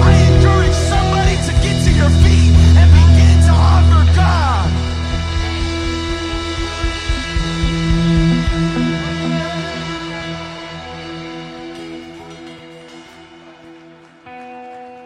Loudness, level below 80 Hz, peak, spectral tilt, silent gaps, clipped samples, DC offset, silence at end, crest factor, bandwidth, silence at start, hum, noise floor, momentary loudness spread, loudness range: -14 LUFS; -20 dBFS; 0 dBFS; -6 dB/octave; none; under 0.1%; under 0.1%; 0.05 s; 14 dB; 10.5 kHz; 0 s; none; -42 dBFS; 21 LU; 21 LU